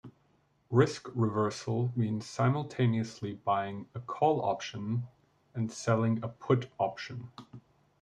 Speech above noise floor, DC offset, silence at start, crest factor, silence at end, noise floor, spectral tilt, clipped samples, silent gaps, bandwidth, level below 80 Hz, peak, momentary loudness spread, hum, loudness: 39 dB; under 0.1%; 0.05 s; 20 dB; 0.4 s; -70 dBFS; -7 dB/octave; under 0.1%; none; 9.6 kHz; -70 dBFS; -12 dBFS; 13 LU; none; -32 LUFS